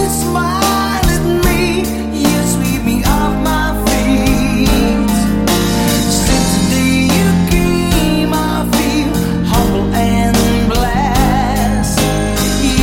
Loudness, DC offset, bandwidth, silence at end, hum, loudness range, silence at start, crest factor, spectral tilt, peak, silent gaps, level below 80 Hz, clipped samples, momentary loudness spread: -13 LUFS; under 0.1%; 17 kHz; 0 s; none; 1 LU; 0 s; 12 dB; -5 dB/octave; 0 dBFS; none; -20 dBFS; under 0.1%; 3 LU